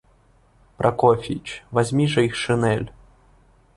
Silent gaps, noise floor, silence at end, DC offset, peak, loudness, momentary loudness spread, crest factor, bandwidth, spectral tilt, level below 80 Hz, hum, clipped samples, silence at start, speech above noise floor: none; -57 dBFS; 0.85 s; under 0.1%; -4 dBFS; -21 LUFS; 10 LU; 20 dB; 11.5 kHz; -6 dB/octave; -50 dBFS; none; under 0.1%; 0.8 s; 36 dB